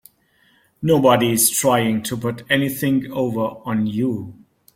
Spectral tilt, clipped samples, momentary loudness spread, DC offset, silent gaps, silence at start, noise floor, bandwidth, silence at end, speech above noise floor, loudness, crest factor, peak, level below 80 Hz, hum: -4.5 dB/octave; under 0.1%; 10 LU; under 0.1%; none; 0.8 s; -59 dBFS; 16.5 kHz; 0.4 s; 40 dB; -19 LUFS; 18 dB; -2 dBFS; -56 dBFS; none